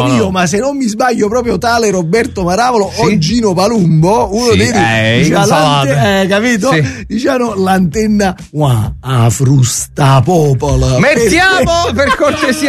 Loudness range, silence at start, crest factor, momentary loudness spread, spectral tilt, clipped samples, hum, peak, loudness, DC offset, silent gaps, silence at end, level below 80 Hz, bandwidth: 2 LU; 0 s; 10 dB; 4 LU; -5 dB/octave; under 0.1%; none; 0 dBFS; -10 LUFS; under 0.1%; none; 0 s; -30 dBFS; 13.5 kHz